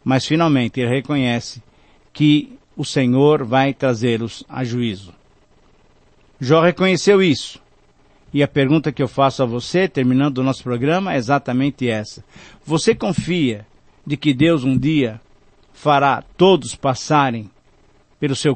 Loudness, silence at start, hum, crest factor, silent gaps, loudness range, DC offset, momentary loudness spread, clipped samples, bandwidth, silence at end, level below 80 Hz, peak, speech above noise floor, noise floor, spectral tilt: -18 LUFS; 0.05 s; none; 16 dB; none; 3 LU; under 0.1%; 11 LU; under 0.1%; 8.8 kHz; 0 s; -50 dBFS; -2 dBFS; 36 dB; -53 dBFS; -6 dB/octave